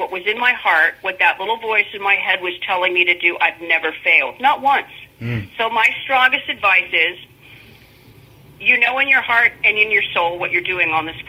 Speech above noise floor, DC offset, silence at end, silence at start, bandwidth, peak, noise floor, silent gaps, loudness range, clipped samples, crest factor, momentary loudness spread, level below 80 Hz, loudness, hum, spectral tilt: 28 dB; under 0.1%; 0.05 s; 0 s; 16.5 kHz; 0 dBFS; -46 dBFS; none; 2 LU; under 0.1%; 18 dB; 7 LU; -56 dBFS; -15 LUFS; none; -4.5 dB/octave